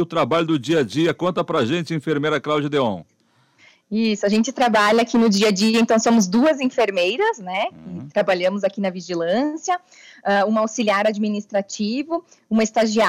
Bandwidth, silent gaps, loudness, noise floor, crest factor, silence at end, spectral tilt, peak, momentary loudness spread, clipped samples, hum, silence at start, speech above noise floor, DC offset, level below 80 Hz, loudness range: 14 kHz; none; -20 LUFS; -58 dBFS; 14 dB; 0 s; -4.5 dB/octave; -6 dBFS; 9 LU; under 0.1%; none; 0 s; 38 dB; under 0.1%; -64 dBFS; 5 LU